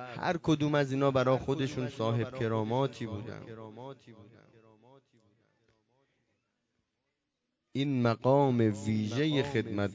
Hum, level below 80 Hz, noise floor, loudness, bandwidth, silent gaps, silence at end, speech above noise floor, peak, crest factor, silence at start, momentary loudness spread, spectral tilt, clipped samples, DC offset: none; -62 dBFS; -84 dBFS; -30 LUFS; 7.8 kHz; none; 0 s; 54 dB; -14 dBFS; 18 dB; 0 s; 17 LU; -7 dB/octave; under 0.1%; under 0.1%